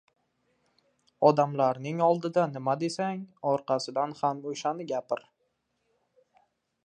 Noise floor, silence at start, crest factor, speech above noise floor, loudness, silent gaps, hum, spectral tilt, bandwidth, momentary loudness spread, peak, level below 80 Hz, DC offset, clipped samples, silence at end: -77 dBFS; 1.2 s; 24 dB; 49 dB; -28 LUFS; none; none; -6 dB/octave; 10 kHz; 9 LU; -6 dBFS; -80 dBFS; under 0.1%; under 0.1%; 1.7 s